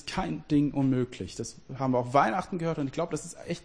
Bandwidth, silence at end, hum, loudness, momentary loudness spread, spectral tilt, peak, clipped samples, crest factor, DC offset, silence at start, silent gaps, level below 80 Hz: 10.5 kHz; 0.05 s; none; -29 LUFS; 12 LU; -6 dB/octave; -8 dBFS; under 0.1%; 20 dB; 0.1%; 0.05 s; none; -54 dBFS